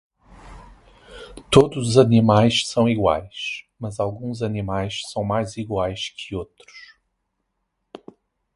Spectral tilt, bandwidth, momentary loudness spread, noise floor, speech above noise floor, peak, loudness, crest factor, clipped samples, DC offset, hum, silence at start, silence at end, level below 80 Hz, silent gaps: -6 dB/octave; 11.5 kHz; 17 LU; -75 dBFS; 55 dB; 0 dBFS; -21 LUFS; 22 dB; under 0.1%; under 0.1%; none; 0.45 s; 1.75 s; -46 dBFS; none